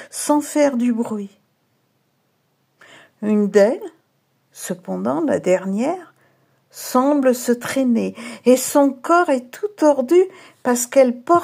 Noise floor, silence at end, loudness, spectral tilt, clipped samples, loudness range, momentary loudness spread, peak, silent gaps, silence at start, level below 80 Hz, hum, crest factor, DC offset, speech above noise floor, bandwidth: -66 dBFS; 0 s; -18 LUFS; -5 dB/octave; under 0.1%; 6 LU; 14 LU; -2 dBFS; none; 0 s; -76 dBFS; none; 18 dB; under 0.1%; 48 dB; 16 kHz